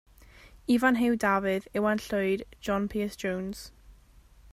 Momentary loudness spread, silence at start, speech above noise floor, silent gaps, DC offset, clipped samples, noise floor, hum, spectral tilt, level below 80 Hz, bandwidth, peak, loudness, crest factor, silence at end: 13 LU; 0.45 s; 28 dB; none; under 0.1%; under 0.1%; -56 dBFS; none; -5.5 dB/octave; -54 dBFS; 15.5 kHz; -10 dBFS; -28 LUFS; 20 dB; 0.6 s